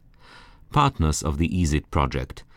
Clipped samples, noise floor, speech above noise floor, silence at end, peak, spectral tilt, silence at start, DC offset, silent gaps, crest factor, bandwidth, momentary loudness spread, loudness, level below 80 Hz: under 0.1%; -49 dBFS; 26 dB; 0.15 s; -6 dBFS; -5.5 dB/octave; 0.35 s; under 0.1%; none; 18 dB; 15.5 kHz; 5 LU; -24 LUFS; -34 dBFS